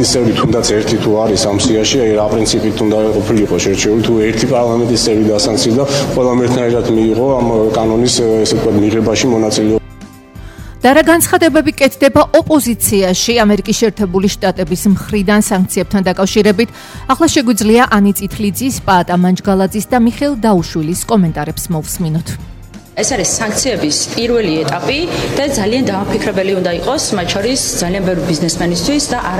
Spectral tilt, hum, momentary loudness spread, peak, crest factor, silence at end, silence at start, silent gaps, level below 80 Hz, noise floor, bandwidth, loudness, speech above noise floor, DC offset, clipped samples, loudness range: -4.5 dB/octave; none; 6 LU; 0 dBFS; 12 dB; 0 s; 0 s; none; -34 dBFS; -34 dBFS; 17 kHz; -12 LUFS; 22 dB; under 0.1%; under 0.1%; 4 LU